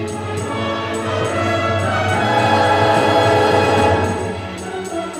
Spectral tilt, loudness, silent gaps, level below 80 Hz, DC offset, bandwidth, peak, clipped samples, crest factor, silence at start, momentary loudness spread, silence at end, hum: -5 dB/octave; -17 LUFS; none; -46 dBFS; under 0.1%; 15 kHz; -4 dBFS; under 0.1%; 14 dB; 0 s; 11 LU; 0 s; none